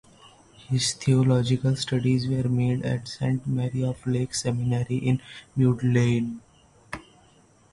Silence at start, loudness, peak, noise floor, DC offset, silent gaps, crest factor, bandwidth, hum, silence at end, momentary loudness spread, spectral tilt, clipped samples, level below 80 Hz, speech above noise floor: 0.7 s; -25 LUFS; -8 dBFS; -57 dBFS; under 0.1%; none; 16 dB; 11.5 kHz; none; 0.7 s; 10 LU; -6 dB/octave; under 0.1%; -54 dBFS; 34 dB